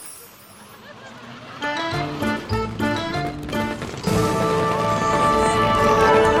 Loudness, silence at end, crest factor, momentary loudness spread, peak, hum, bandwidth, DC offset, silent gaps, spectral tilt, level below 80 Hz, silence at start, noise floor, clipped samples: -20 LUFS; 0 s; 16 dB; 22 LU; -4 dBFS; none; 17 kHz; under 0.1%; none; -5 dB/octave; -40 dBFS; 0 s; -44 dBFS; under 0.1%